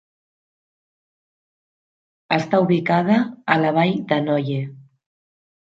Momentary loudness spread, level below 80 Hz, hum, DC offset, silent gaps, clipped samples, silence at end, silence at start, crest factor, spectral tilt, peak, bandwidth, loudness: 7 LU; -68 dBFS; none; under 0.1%; none; under 0.1%; 0.85 s; 2.3 s; 20 dB; -7.5 dB/octave; -2 dBFS; 7.6 kHz; -20 LUFS